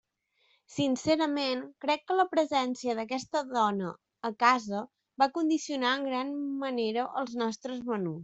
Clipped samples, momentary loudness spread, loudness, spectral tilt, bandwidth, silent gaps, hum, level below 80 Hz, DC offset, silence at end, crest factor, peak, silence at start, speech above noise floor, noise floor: under 0.1%; 10 LU; -30 LUFS; -4.5 dB/octave; 8.2 kHz; none; none; -72 dBFS; under 0.1%; 0 s; 22 dB; -8 dBFS; 0.7 s; 42 dB; -72 dBFS